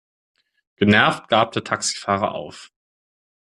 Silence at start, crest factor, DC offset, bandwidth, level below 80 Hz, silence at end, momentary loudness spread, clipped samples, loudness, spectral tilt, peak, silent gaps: 0.8 s; 20 dB; under 0.1%; 11.5 kHz; -60 dBFS; 0.9 s; 12 LU; under 0.1%; -19 LUFS; -4 dB/octave; -2 dBFS; none